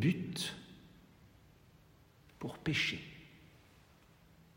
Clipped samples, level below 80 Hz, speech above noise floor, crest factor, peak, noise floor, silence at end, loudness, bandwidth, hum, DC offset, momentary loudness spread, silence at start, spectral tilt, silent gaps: under 0.1%; -68 dBFS; 28 dB; 22 dB; -20 dBFS; -64 dBFS; 1.1 s; -37 LUFS; 16 kHz; none; under 0.1%; 27 LU; 0 s; -4.5 dB/octave; none